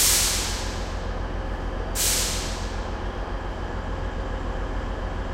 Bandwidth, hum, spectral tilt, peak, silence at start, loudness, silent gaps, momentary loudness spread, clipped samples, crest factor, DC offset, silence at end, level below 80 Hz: 16 kHz; none; -2.5 dB/octave; -8 dBFS; 0 s; -27 LUFS; none; 11 LU; under 0.1%; 18 dB; under 0.1%; 0 s; -30 dBFS